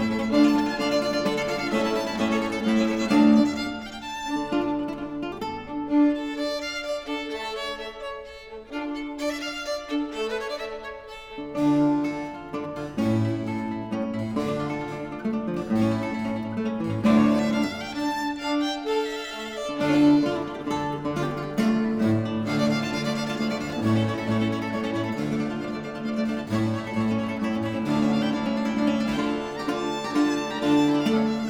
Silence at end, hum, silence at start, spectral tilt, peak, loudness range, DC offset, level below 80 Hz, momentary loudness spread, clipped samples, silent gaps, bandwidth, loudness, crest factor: 0 s; none; 0 s; -6 dB/octave; -8 dBFS; 5 LU; under 0.1%; -52 dBFS; 11 LU; under 0.1%; none; 15 kHz; -25 LUFS; 16 dB